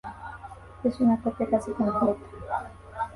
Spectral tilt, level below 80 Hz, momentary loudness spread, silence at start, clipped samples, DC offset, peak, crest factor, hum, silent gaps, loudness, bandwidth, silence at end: -8 dB/octave; -50 dBFS; 17 LU; 0.05 s; under 0.1%; under 0.1%; -10 dBFS; 18 dB; none; none; -27 LUFS; 11.5 kHz; 0 s